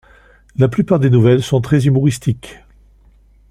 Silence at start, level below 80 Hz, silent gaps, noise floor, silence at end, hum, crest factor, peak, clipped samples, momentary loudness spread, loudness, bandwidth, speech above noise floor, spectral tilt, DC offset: 0.6 s; -44 dBFS; none; -48 dBFS; 0.95 s; none; 14 dB; -2 dBFS; under 0.1%; 10 LU; -14 LUFS; 12.5 kHz; 35 dB; -7.5 dB/octave; under 0.1%